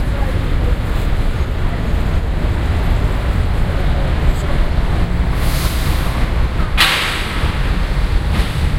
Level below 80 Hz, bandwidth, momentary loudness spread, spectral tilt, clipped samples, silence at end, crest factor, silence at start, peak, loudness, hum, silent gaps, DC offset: -16 dBFS; 16 kHz; 3 LU; -5 dB/octave; under 0.1%; 0 s; 14 dB; 0 s; 0 dBFS; -18 LUFS; none; none; under 0.1%